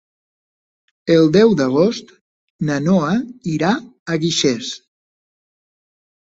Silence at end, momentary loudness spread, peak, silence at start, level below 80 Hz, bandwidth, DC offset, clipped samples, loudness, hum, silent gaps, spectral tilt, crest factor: 1.5 s; 13 LU; -2 dBFS; 1.05 s; -56 dBFS; 8 kHz; under 0.1%; under 0.1%; -17 LUFS; none; 2.21-2.59 s, 3.99-4.06 s; -5.5 dB/octave; 18 dB